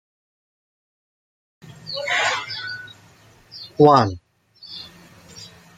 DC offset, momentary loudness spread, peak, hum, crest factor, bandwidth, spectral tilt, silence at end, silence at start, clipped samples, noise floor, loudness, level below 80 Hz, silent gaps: under 0.1%; 26 LU; -2 dBFS; none; 22 dB; 13 kHz; -5 dB/octave; 0.3 s; 1.65 s; under 0.1%; -51 dBFS; -19 LUFS; -62 dBFS; none